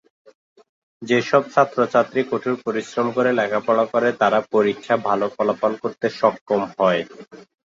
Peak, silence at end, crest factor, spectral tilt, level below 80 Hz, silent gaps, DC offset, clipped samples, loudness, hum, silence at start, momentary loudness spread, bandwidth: -2 dBFS; 0.35 s; 18 dB; -6 dB/octave; -66 dBFS; 6.41-6.46 s; under 0.1%; under 0.1%; -20 LUFS; none; 1 s; 7 LU; 7.8 kHz